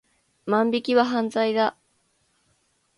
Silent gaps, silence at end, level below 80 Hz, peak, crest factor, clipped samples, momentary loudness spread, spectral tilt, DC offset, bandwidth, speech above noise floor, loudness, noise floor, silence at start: none; 1.25 s; -72 dBFS; -6 dBFS; 20 dB; under 0.1%; 5 LU; -5.5 dB/octave; under 0.1%; 11.5 kHz; 46 dB; -23 LUFS; -68 dBFS; 0.45 s